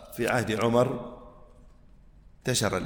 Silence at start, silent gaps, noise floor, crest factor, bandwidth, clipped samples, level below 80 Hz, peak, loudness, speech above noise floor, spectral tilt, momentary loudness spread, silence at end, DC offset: 0 s; none; -53 dBFS; 18 dB; 19.5 kHz; under 0.1%; -52 dBFS; -10 dBFS; -27 LUFS; 27 dB; -4.5 dB/octave; 16 LU; 0 s; under 0.1%